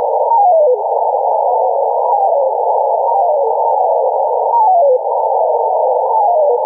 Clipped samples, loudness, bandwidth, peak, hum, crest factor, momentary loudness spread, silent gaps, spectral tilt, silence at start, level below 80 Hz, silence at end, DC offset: under 0.1%; -13 LUFS; 1.1 kHz; -4 dBFS; none; 10 dB; 4 LU; none; -8.5 dB/octave; 0 s; -86 dBFS; 0 s; under 0.1%